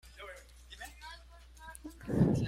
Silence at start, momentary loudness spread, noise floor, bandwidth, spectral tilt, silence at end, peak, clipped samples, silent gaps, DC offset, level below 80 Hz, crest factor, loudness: 0.05 s; 22 LU; -54 dBFS; 15.5 kHz; -7.5 dB/octave; 0 s; -16 dBFS; under 0.1%; none; under 0.1%; -52 dBFS; 20 dB; -38 LUFS